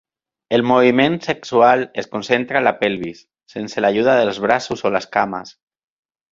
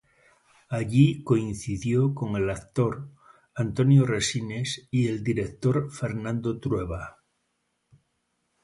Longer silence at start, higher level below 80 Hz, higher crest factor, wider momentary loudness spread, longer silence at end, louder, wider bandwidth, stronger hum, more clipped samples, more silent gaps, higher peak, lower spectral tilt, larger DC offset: second, 0.5 s vs 0.7 s; second, -58 dBFS vs -50 dBFS; about the same, 18 dB vs 20 dB; about the same, 13 LU vs 12 LU; second, 0.8 s vs 1.55 s; first, -17 LUFS vs -26 LUFS; second, 7.6 kHz vs 11.5 kHz; neither; neither; neither; first, 0 dBFS vs -8 dBFS; about the same, -5.5 dB/octave vs -6.5 dB/octave; neither